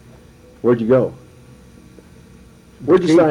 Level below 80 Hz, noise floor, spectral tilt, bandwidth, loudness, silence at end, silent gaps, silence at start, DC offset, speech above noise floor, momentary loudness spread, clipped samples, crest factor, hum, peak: -50 dBFS; -44 dBFS; -7.5 dB/octave; 11 kHz; -16 LUFS; 0 s; none; 0.65 s; under 0.1%; 31 dB; 12 LU; under 0.1%; 14 dB; none; -4 dBFS